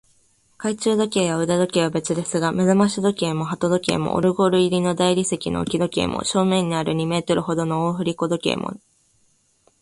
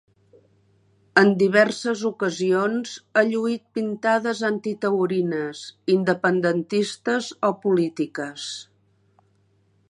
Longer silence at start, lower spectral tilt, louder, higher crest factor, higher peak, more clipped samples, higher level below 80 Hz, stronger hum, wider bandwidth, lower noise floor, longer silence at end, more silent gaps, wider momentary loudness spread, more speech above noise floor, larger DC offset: second, 0.6 s vs 1.15 s; about the same, -5 dB/octave vs -5.5 dB/octave; about the same, -21 LUFS vs -22 LUFS; about the same, 18 dB vs 22 dB; about the same, -4 dBFS vs -2 dBFS; neither; first, -52 dBFS vs -72 dBFS; neither; about the same, 11.5 kHz vs 11 kHz; about the same, -62 dBFS vs -63 dBFS; second, 1.05 s vs 1.25 s; neither; second, 6 LU vs 11 LU; about the same, 42 dB vs 41 dB; neither